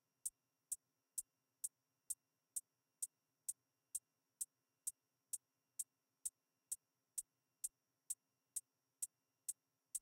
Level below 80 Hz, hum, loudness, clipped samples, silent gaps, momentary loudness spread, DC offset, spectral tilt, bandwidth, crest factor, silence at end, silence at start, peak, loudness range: under -90 dBFS; none; -50 LUFS; under 0.1%; none; 1 LU; under 0.1%; 3 dB/octave; 16.5 kHz; 24 dB; 0 s; 0.25 s; -30 dBFS; 1 LU